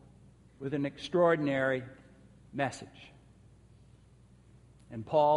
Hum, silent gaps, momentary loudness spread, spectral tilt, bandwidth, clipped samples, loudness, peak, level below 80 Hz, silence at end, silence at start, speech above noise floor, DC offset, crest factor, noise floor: none; none; 21 LU; -6.5 dB/octave; 11.5 kHz; under 0.1%; -31 LUFS; -14 dBFS; -64 dBFS; 0 s; 0.6 s; 29 dB; under 0.1%; 20 dB; -59 dBFS